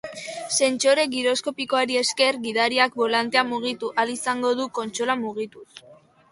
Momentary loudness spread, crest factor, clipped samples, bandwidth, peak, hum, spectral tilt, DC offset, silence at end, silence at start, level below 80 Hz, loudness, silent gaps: 8 LU; 18 dB; under 0.1%; 11.5 kHz; -6 dBFS; none; -1.5 dB/octave; under 0.1%; 0.35 s; 0.05 s; -70 dBFS; -22 LUFS; none